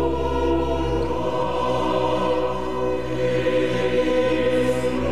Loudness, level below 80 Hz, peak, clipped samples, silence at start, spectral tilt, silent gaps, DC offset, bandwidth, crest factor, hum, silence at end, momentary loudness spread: -22 LUFS; -36 dBFS; -10 dBFS; under 0.1%; 0 s; -6.5 dB/octave; none; 2%; 13 kHz; 12 dB; none; 0 s; 4 LU